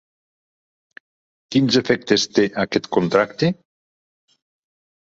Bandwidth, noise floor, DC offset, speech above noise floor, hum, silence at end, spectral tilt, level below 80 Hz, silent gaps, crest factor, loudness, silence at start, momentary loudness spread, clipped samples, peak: 7.8 kHz; under -90 dBFS; under 0.1%; over 72 dB; none; 1.5 s; -5 dB/octave; -58 dBFS; none; 20 dB; -19 LUFS; 1.5 s; 5 LU; under 0.1%; -2 dBFS